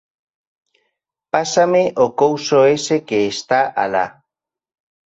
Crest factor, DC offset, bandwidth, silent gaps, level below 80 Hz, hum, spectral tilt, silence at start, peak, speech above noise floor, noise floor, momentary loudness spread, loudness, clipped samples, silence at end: 16 dB; under 0.1%; 8 kHz; none; -62 dBFS; none; -4 dB/octave; 1.35 s; -2 dBFS; 66 dB; -82 dBFS; 7 LU; -16 LUFS; under 0.1%; 0.95 s